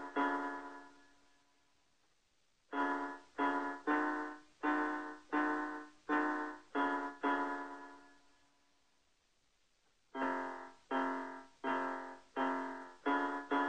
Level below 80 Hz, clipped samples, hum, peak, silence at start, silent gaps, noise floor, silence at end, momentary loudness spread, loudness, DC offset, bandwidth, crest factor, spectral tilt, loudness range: -80 dBFS; under 0.1%; none; -22 dBFS; 0 s; none; -77 dBFS; 0 s; 12 LU; -39 LUFS; under 0.1%; 9.2 kHz; 18 dB; -4 dB/octave; 7 LU